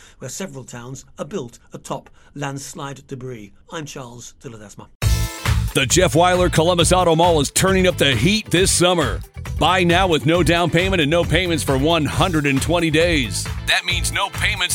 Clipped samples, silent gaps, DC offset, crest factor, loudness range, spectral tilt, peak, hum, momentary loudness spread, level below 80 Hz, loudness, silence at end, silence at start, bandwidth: under 0.1%; 4.95-5.00 s; under 0.1%; 18 dB; 16 LU; -4 dB/octave; -2 dBFS; none; 19 LU; -30 dBFS; -17 LUFS; 0 s; 0.2 s; 18.5 kHz